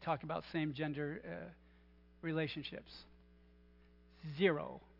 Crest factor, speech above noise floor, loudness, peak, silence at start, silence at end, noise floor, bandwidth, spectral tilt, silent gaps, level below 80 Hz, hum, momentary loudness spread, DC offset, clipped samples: 24 dB; 25 dB; -40 LUFS; -18 dBFS; 0 s; 0.1 s; -65 dBFS; 5.8 kHz; -4.5 dB/octave; none; -66 dBFS; 60 Hz at -65 dBFS; 18 LU; under 0.1%; under 0.1%